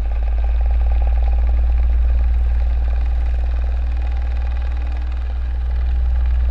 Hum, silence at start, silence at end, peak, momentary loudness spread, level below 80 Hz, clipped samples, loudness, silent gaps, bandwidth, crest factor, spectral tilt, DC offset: none; 0 s; 0 s; -8 dBFS; 5 LU; -16 dBFS; under 0.1%; -20 LUFS; none; 4.1 kHz; 8 dB; -8.5 dB/octave; under 0.1%